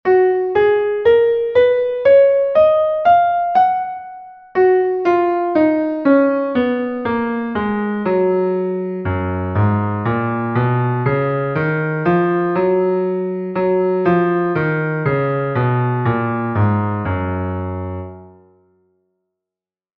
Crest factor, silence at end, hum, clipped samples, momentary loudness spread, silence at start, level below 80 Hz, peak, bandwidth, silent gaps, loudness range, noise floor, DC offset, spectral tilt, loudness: 14 dB; 1.7 s; none; under 0.1%; 8 LU; 0.05 s; -50 dBFS; -2 dBFS; 5.4 kHz; none; 6 LU; -90 dBFS; under 0.1%; -10.5 dB/octave; -16 LUFS